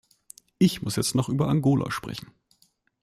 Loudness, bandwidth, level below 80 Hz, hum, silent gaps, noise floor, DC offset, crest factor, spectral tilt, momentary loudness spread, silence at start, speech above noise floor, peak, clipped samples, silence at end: -25 LUFS; 15.5 kHz; -56 dBFS; none; none; -66 dBFS; under 0.1%; 18 dB; -5.5 dB/octave; 11 LU; 0.6 s; 42 dB; -10 dBFS; under 0.1%; 0.8 s